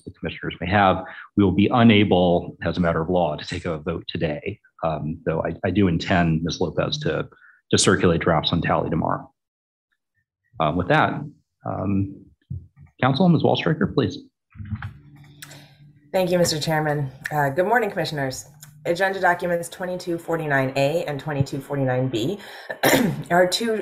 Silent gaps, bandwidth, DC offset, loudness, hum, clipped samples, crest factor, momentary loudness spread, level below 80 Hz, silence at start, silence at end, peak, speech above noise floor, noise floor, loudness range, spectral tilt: 9.48-9.88 s; 16 kHz; under 0.1%; -22 LUFS; none; under 0.1%; 20 dB; 15 LU; -48 dBFS; 0.05 s; 0 s; -2 dBFS; 29 dB; -50 dBFS; 5 LU; -5.5 dB/octave